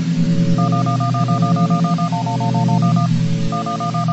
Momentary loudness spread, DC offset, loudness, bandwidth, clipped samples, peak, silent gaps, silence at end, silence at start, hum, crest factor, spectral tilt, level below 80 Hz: 4 LU; under 0.1%; -17 LUFS; 8.2 kHz; under 0.1%; -4 dBFS; none; 0 s; 0 s; none; 12 dB; -7.5 dB/octave; -42 dBFS